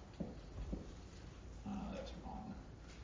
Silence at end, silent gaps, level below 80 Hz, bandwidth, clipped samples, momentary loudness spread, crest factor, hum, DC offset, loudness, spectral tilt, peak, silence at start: 0 s; none; -54 dBFS; 7.6 kHz; under 0.1%; 9 LU; 16 dB; none; under 0.1%; -50 LUFS; -6.5 dB/octave; -32 dBFS; 0 s